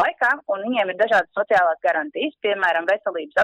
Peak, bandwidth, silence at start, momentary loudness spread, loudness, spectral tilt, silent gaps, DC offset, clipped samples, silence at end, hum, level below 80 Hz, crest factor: -10 dBFS; 9.4 kHz; 0 s; 5 LU; -21 LUFS; -4 dB/octave; none; under 0.1%; under 0.1%; 0 s; none; -64 dBFS; 12 dB